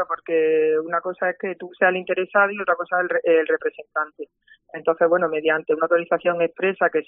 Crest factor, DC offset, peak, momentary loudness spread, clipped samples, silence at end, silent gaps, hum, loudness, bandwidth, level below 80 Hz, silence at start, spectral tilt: 18 dB; under 0.1%; -4 dBFS; 8 LU; under 0.1%; 0.05 s; none; none; -21 LUFS; 3.7 kHz; -72 dBFS; 0 s; -3 dB/octave